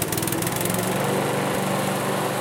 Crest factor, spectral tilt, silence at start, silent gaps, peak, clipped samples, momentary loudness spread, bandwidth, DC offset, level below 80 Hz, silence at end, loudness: 16 dB; -4 dB/octave; 0 s; none; -8 dBFS; under 0.1%; 1 LU; 17.5 kHz; under 0.1%; -52 dBFS; 0 s; -23 LUFS